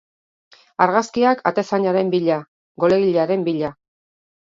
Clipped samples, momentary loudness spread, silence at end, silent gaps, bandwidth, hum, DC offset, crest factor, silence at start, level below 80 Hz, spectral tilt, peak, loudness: under 0.1%; 8 LU; 0.9 s; 2.48-2.75 s; 7.8 kHz; none; under 0.1%; 20 dB; 0.8 s; -62 dBFS; -6.5 dB/octave; 0 dBFS; -19 LUFS